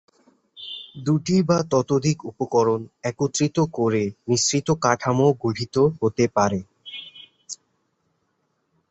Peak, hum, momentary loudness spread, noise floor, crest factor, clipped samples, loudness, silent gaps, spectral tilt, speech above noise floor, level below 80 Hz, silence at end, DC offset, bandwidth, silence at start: -4 dBFS; none; 17 LU; -71 dBFS; 20 dB; under 0.1%; -22 LUFS; none; -5 dB/octave; 50 dB; -56 dBFS; 1.35 s; under 0.1%; 8.4 kHz; 0.55 s